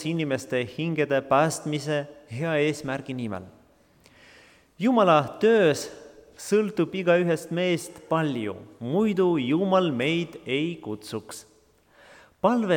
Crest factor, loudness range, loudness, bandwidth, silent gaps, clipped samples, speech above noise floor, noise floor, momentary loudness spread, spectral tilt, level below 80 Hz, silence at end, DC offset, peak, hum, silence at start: 18 dB; 5 LU; -25 LUFS; 18.5 kHz; none; under 0.1%; 35 dB; -60 dBFS; 14 LU; -5.5 dB/octave; -66 dBFS; 0 s; under 0.1%; -6 dBFS; none; 0 s